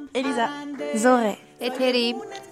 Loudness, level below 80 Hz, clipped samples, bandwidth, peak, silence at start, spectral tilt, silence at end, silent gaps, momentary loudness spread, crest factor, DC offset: -23 LUFS; -72 dBFS; under 0.1%; 15 kHz; -4 dBFS; 0 s; -3.5 dB/octave; 0 s; none; 11 LU; 20 dB; under 0.1%